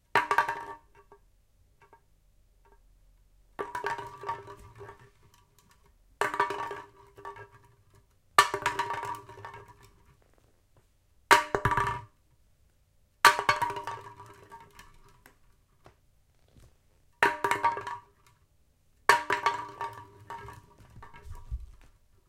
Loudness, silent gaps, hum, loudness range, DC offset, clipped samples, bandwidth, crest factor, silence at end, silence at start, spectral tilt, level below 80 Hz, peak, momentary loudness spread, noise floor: -28 LUFS; none; none; 14 LU; under 0.1%; under 0.1%; 16.5 kHz; 32 dB; 0.55 s; 0.15 s; -2.5 dB/octave; -54 dBFS; -2 dBFS; 27 LU; -66 dBFS